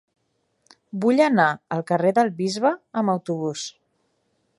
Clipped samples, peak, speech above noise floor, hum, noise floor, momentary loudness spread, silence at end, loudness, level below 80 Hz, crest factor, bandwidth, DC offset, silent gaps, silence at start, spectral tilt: under 0.1%; -4 dBFS; 50 dB; none; -71 dBFS; 11 LU; 0.9 s; -22 LUFS; -74 dBFS; 20 dB; 11.5 kHz; under 0.1%; none; 0.95 s; -5.5 dB/octave